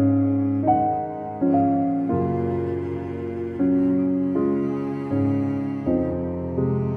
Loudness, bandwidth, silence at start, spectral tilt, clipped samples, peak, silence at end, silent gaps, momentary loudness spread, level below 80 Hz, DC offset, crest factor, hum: -23 LUFS; 3.3 kHz; 0 s; -11.5 dB/octave; under 0.1%; -8 dBFS; 0 s; none; 8 LU; -54 dBFS; under 0.1%; 14 dB; none